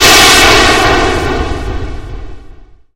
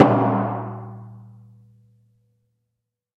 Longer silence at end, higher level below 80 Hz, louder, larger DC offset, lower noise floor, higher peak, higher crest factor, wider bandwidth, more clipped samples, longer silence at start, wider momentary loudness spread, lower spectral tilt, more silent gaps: second, 0.3 s vs 1.95 s; first, -20 dBFS vs -64 dBFS; first, -6 LUFS vs -22 LUFS; neither; second, -34 dBFS vs -81 dBFS; about the same, 0 dBFS vs -2 dBFS; second, 10 dB vs 22 dB; first, over 20 kHz vs 5.4 kHz; first, 2% vs under 0.1%; about the same, 0 s vs 0 s; second, 22 LU vs 25 LU; second, -2 dB/octave vs -9.5 dB/octave; neither